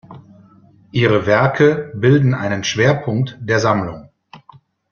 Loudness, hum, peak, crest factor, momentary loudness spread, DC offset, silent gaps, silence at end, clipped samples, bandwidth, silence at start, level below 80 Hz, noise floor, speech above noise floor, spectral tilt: -16 LUFS; none; -2 dBFS; 16 dB; 8 LU; under 0.1%; none; 0.55 s; under 0.1%; 7 kHz; 0.1 s; -50 dBFS; -48 dBFS; 33 dB; -6 dB/octave